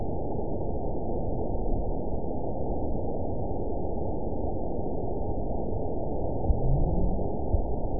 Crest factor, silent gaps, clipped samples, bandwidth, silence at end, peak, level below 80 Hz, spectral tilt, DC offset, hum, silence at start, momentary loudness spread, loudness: 18 dB; none; under 0.1%; 1 kHz; 0 s; -10 dBFS; -32 dBFS; -17 dB/octave; 3%; none; 0 s; 4 LU; -32 LUFS